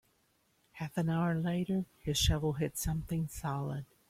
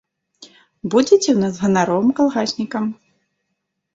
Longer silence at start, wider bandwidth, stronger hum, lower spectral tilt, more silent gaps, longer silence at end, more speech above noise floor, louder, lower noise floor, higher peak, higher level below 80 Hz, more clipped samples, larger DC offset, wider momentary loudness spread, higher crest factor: first, 0.75 s vs 0.4 s; first, 16 kHz vs 8 kHz; neither; about the same, -5 dB/octave vs -5 dB/octave; neither; second, 0.25 s vs 1 s; second, 40 dB vs 59 dB; second, -34 LUFS vs -17 LUFS; about the same, -73 dBFS vs -75 dBFS; second, -18 dBFS vs -2 dBFS; first, -48 dBFS vs -60 dBFS; neither; neither; second, 7 LU vs 10 LU; about the same, 18 dB vs 18 dB